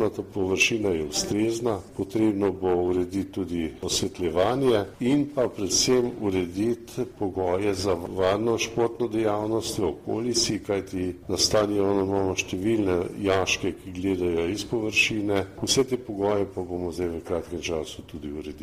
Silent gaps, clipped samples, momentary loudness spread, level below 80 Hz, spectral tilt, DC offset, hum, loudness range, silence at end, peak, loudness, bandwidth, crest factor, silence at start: none; under 0.1%; 9 LU; -50 dBFS; -4 dB/octave; under 0.1%; none; 2 LU; 0 s; -8 dBFS; -25 LUFS; 15.5 kHz; 18 dB; 0 s